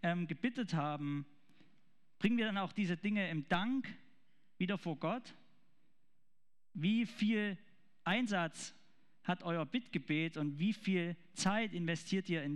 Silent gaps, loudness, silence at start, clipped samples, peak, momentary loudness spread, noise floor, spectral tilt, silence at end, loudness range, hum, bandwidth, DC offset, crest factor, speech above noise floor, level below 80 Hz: none; -38 LUFS; 0.05 s; under 0.1%; -20 dBFS; 9 LU; -90 dBFS; -5.5 dB/octave; 0 s; 3 LU; none; 11.5 kHz; 0.1%; 18 dB; 53 dB; -74 dBFS